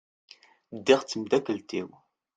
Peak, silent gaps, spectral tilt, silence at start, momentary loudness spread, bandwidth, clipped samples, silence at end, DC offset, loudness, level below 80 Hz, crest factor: -6 dBFS; none; -4 dB/octave; 0.7 s; 17 LU; 9.2 kHz; under 0.1%; 0.5 s; under 0.1%; -27 LUFS; -70 dBFS; 24 dB